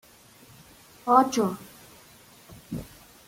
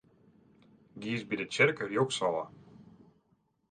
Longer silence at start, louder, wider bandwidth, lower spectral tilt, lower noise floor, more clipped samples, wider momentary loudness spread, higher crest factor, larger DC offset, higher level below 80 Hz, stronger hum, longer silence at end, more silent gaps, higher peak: about the same, 1.05 s vs 0.95 s; first, -25 LUFS vs -31 LUFS; first, 16.5 kHz vs 9.6 kHz; about the same, -5 dB/octave vs -4.5 dB/octave; second, -53 dBFS vs -73 dBFS; neither; first, 24 LU vs 12 LU; about the same, 24 dB vs 24 dB; neither; first, -60 dBFS vs -74 dBFS; neither; second, 0.45 s vs 0.9 s; neither; first, -4 dBFS vs -12 dBFS